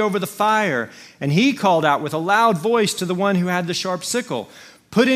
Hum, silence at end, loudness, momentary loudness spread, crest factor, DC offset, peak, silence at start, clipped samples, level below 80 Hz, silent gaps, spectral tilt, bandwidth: none; 0 s; -19 LUFS; 10 LU; 18 dB; under 0.1%; -2 dBFS; 0 s; under 0.1%; -64 dBFS; none; -4.5 dB/octave; 16 kHz